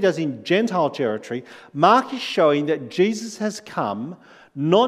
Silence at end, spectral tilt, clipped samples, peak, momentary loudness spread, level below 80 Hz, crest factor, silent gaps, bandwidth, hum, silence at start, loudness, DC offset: 0 s; -5.5 dB/octave; under 0.1%; -2 dBFS; 15 LU; -76 dBFS; 20 dB; none; 13.5 kHz; none; 0 s; -21 LUFS; under 0.1%